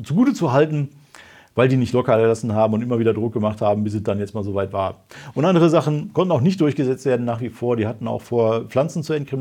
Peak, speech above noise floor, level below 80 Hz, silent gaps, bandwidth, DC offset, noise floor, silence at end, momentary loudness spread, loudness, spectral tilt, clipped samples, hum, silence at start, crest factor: -2 dBFS; 27 dB; -60 dBFS; none; 14.5 kHz; under 0.1%; -46 dBFS; 0 s; 8 LU; -20 LUFS; -7.5 dB/octave; under 0.1%; none; 0 s; 18 dB